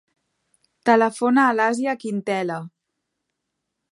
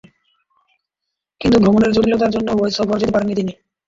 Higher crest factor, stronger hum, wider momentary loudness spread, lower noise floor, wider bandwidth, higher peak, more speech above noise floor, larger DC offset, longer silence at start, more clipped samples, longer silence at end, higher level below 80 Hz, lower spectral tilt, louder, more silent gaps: about the same, 20 dB vs 16 dB; neither; about the same, 9 LU vs 9 LU; about the same, -79 dBFS vs -81 dBFS; first, 11.5 kHz vs 7.6 kHz; about the same, -2 dBFS vs -2 dBFS; second, 60 dB vs 65 dB; neither; second, 0.85 s vs 1.4 s; neither; first, 1.25 s vs 0.35 s; second, -78 dBFS vs -42 dBFS; about the same, -5.5 dB/octave vs -6.5 dB/octave; second, -20 LUFS vs -16 LUFS; neither